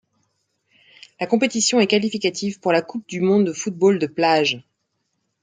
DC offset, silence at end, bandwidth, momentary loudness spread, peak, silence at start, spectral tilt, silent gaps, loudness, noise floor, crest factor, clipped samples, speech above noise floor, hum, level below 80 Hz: under 0.1%; 0.8 s; 9.6 kHz; 6 LU; -2 dBFS; 1.2 s; -4 dB/octave; none; -20 LUFS; -73 dBFS; 18 dB; under 0.1%; 54 dB; none; -66 dBFS